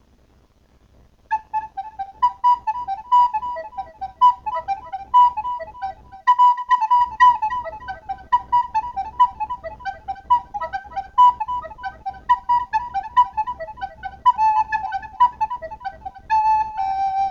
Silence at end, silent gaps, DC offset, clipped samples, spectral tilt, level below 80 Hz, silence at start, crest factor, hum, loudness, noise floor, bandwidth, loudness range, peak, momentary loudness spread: 0 s; none; under 0.1%; under 0.1%; -3.5 dB/octave; -50 dBFS; 1.3 s; 18 dB; none; -20 LUFS; -56 dBFS; 7.2 kHz; 4 LU; -4 dBFS; 17 LU